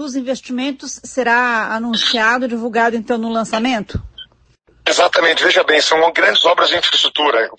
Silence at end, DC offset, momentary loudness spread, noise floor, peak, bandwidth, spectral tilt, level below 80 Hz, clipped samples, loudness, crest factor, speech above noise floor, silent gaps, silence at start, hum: 0.05 s; under 0.1%; 11 LU; -54 dBFS; 0 dBFS; 9.6 kHz; -2.5 dB/octave; -46 dBFS; under 0.1%; -14 LUFS; 16 dB; 38 dB; none; 0 s; none